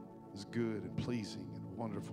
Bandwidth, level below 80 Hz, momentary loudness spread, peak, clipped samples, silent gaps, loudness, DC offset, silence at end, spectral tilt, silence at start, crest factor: 15 kHz; -68 dBFS; 9 LU; -26 dBFS; under 0.1%; none; -42 LUFS; under 0.1%; 0 s; -6.5 dB/octave; 0 s; 16 dB